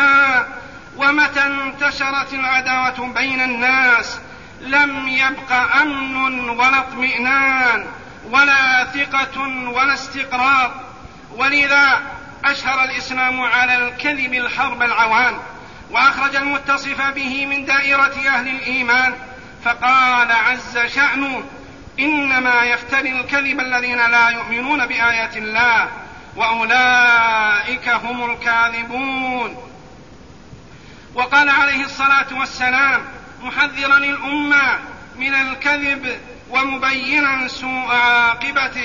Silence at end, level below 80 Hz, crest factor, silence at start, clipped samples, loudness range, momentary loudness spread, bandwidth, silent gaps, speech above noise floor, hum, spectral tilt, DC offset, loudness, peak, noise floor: 0 s; -48 dBFS; 16 dB; 0 s; under 0.1%; 2 LU; 10 LU; 7.4 kHz; none; 24 dB; none; -2.5 dB/octave; 0.4%; -15 LUFS; -2 dBFS; -41 dBFS